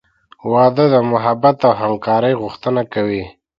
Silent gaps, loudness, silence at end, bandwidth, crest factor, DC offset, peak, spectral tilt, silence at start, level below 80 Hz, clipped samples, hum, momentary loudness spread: none; -15 LUFS; 0.3 s; 6.4 kHz; 16 dB; under 0.1%; 0 dBFS; -9 dB/octave; 0.45 s; -52 dBFS; under 0.1%; none; 8 LU